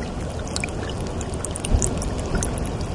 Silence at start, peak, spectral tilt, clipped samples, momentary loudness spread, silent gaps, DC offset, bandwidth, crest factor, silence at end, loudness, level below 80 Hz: 0 s; -2 dBFS; -4.5 dB/octave; under 0.1%; 6 LU; none; under 0.1%; 11.5 kHz; 22 dB; 0 s; -26 LUFS; -30 dBFS